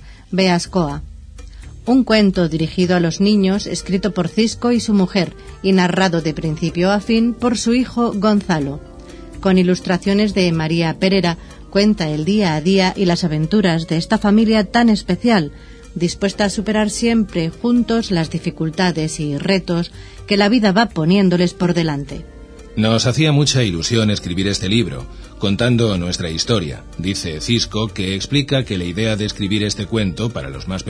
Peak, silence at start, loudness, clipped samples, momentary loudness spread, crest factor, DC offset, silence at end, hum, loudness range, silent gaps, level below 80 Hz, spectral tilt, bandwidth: 0 dBFS; 0 s; -17 LUFS; under 0.1%; 9 LU; 16 dB; under 0.1%; 0 s; none; 3 LU; none; -38 dBFS; -5.5 dB/octave; 10.5 kHz